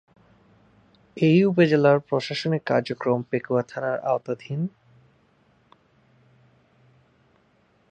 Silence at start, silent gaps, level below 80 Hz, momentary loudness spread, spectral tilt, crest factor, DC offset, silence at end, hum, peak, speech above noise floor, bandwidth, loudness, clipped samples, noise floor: 1.15 s; none; -68 dBFS; 12 LU; -7.5 dB/octave; 20 dB; under 0.1%; 3.25 s; none; -6 dBFS; 41 dB; 8.8 kHz; -23 LUFS; under 0.1%; -63 dBFS